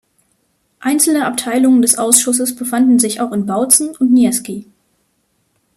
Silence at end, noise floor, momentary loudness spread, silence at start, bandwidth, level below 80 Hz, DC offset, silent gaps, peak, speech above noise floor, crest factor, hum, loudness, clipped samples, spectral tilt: 1.15 s; -63 dBFS; 8 LU; 0.8 s; 15.5 kHz; -60 dBFS; under 0.1%; none; 0 dBFS; 50 dB; 14 dB; none; -13 LUFS; under 0.1%; -3 dB/octave